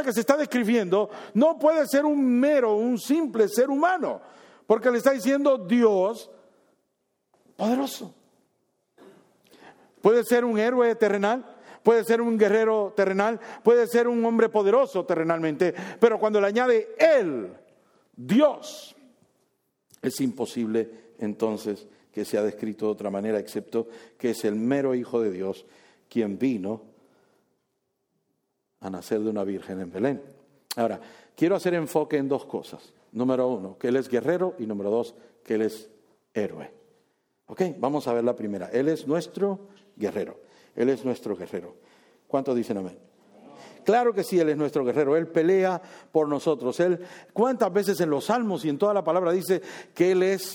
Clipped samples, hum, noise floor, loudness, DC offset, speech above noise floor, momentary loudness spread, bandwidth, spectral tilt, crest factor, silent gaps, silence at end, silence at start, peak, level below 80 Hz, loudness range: under 0.1%; none; -77 dBFS; -25 LUFS; under 0.1%; 53 dB; 13 LU; 19 kHz; -6 dB/octave; 22 dB; none; 0 s; 0 s; -4 dBFS; -76 dBFS; 9 LU